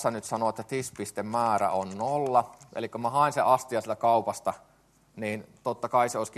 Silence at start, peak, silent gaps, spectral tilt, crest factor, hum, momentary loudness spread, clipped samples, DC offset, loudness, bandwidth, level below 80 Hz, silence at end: 0 s; -8 dBFS; none; -5 dB/octave; 20 dB; none; 10 LU; under 0.1%; under 0.1%; -28 LUFS; 13 kHz; -70 dBFS; 0 s